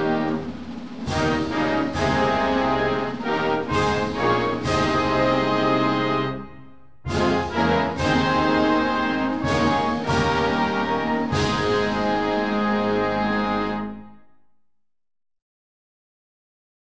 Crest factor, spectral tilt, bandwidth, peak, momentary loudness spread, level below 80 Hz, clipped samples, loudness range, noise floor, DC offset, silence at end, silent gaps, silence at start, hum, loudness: 16 dB; -6 dB/octave; 8 kHz; -8 dBFS; 7 LU; -42 dBFS; under 0.1%; 4 LU; -68 dBFS; 0.7%; 1.55 s; none; 0 s; none; -22 LUFS